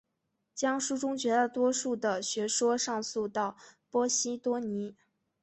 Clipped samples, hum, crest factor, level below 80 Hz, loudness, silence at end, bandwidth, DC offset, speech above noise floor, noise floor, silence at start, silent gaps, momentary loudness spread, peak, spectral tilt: under 0.1%; none; 18 dB; -76 dBFS; -31 LUFS; 0.5 s; 8.6 kHz; under 0.1%; 51 dB; -81 dBFS; 0.55 s; none; 7 LU; -14 dBFS; -2.5 dB/octave